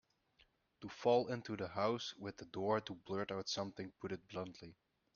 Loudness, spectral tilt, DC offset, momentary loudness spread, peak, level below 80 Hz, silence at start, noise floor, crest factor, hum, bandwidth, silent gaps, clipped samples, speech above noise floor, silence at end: -41 LUFS; -4 dB/octave; under 0.1%; 15 LU; -22 dBFS; -76 dBFS; 0.8 s; -75 dBFS; 20 dB; none; 7 kHz; none; under 0.1%; 34 dB; 0.45 s